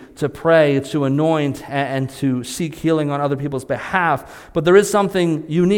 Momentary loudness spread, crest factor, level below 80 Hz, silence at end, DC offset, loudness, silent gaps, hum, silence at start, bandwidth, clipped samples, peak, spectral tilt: 10 LU; 18 dB; -50 dBFS; 0 s; under 0.1%; -18 LUFS; none; none; 0 s; 17 kHz; under 0.1%; 0 dBFS; -6 dB/octave